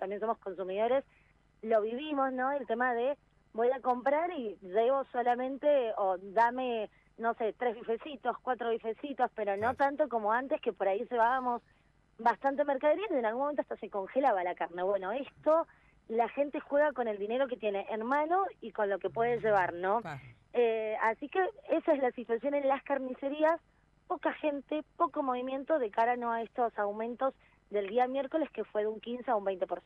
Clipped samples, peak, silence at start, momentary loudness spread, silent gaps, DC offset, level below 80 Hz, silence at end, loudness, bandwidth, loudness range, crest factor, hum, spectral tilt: under 0.1%; -16 dBFS; 0 s; 8 LU; none; under 0.1%; -70 dBFS; 0.05 s; -32 LUFS; 7 kHz; 2 LU; 16 dB; none; -7 dB/octave